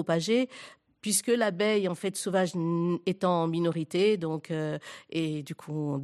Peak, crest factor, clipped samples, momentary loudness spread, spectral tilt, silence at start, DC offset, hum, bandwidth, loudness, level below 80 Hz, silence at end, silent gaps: -14 dBFS; 16 dB; under 0.1%; 10 LU; -5 dB/octave; 0 s; under 0.1%; none; 13.5 kHz; -29 LUFS; -76 dBFS; 0 s; none